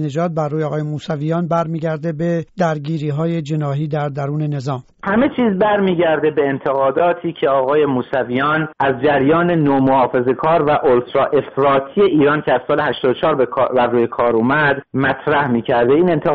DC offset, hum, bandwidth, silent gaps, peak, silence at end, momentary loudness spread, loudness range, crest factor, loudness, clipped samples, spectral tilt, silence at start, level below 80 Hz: under 0.1%; none; 7.8 kHz; none; -4 dBFS; 0 s; 7 LU; 5 LU; 12 dB; -16 LUFS; under 0.1%; -5.5 dB/octave; 0 s; -50 dBFS